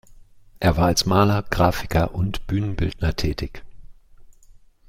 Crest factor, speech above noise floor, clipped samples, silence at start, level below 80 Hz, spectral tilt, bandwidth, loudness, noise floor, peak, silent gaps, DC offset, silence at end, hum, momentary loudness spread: 20 dB; 29 dB; under 0.1%; 0.1 s; -34 dBFS; -5.5 dB/octave; 16 kHz; -22 LUFS; -49 dBFS; -4 dBFS; none; under 0.1%; 0.3 s; none; 9 LU